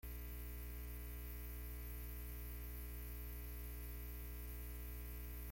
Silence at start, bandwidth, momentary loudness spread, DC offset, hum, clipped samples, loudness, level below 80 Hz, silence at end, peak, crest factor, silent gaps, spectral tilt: 0.05 s; 17 kHz; 0 LU; under 0.1%; 60 Hz at -50 dBFS; under 0.1%; -50 LUFS; -50 dBFS; 0 s; -40 dBFS; 10 dB; none; -5 dB/octave